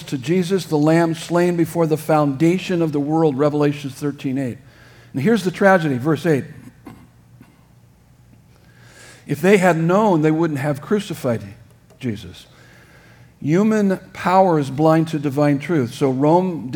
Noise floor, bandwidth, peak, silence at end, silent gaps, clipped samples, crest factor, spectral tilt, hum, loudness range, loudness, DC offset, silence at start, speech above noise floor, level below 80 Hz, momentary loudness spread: -50 dBFS; 19 kHz; 0 dBFS; 0 s; none; under 0.1%; 18 dB; -7 dB/octave; none; 6 LU; -18 LUFS; under 0.1%; 0 s; 33 dB; -58 dBFS; 12 LU